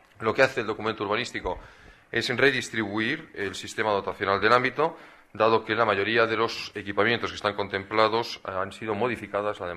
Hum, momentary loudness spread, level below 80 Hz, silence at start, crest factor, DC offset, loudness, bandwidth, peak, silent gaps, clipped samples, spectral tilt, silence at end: none; 9 LU; -56 dBFS; 0.2 s; 22 dB; under 0.1%; -26 LUFS; 13.5 kHz; -6 dBFS; none; under 0.1%; -4.5 dB/octave; 0 s